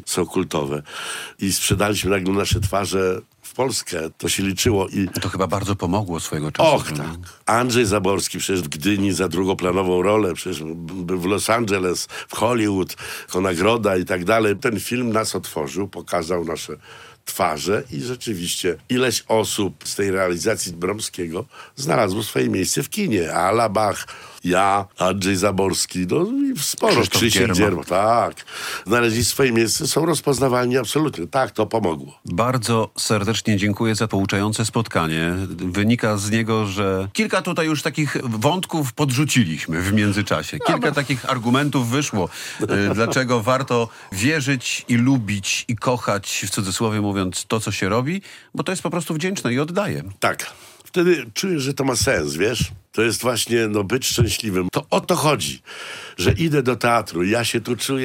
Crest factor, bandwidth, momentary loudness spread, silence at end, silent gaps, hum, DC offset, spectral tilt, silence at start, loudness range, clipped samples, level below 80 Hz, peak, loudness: 18 dB; 17 kHz; 9 LU; 0 s; none; none; under 0.1%; -4.5 dB/octave; 0 s; 4 LU; under 0.1%; -48 dBFS; -4 dBFS; -20 LUFS